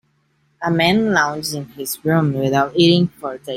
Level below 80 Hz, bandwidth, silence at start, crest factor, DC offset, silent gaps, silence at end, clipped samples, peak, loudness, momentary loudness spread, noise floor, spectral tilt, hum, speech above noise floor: -54 dBFS; 16.5 kHz; 0.6 s; 16 dB; under 0.1%; none; 0 s; under 0.1%; -2 dBFS; -17 LUFS; 12 LU; -63 dBFS; -5 dB/octave; none; 45 dB